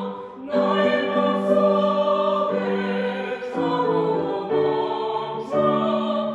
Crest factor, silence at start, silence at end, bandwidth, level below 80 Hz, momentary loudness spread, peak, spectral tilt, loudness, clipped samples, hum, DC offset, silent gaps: 14 dB; 0 s; 0 s; 8 kHz; -68 dBFS; 7 LU; -8 dBFS; -7.5 dB/octave; -22 LUFS; under 0.1%; none; under 0.1%; none